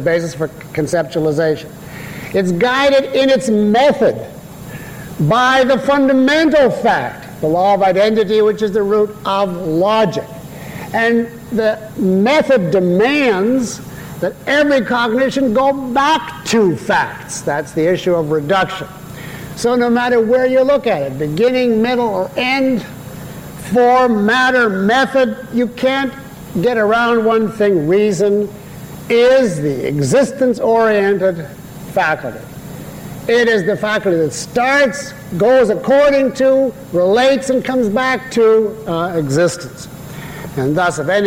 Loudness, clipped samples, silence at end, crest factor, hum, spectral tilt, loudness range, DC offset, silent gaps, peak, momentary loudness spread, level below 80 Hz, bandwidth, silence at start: -14 LUFS; under 0.1%; 0 s; 10 dB; none; -5.5 dB/octave; 3 LU; under 0.1%; none; -4 dBFS; 17 LU; -46 dBFS; 16.5 kHz; 0 s